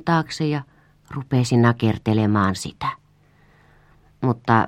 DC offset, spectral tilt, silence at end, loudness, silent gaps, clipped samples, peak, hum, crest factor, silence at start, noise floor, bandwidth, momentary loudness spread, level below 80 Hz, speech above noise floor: under 0.1%; -6.5 dB/octave; 0 s; -21 LUFS; none; under 0.1%; 0 dBFS; none; 22 dB; 0.05 s; -56 dBFS; 11.5 kHz; 11 LU; -52 dBFS; 36 dB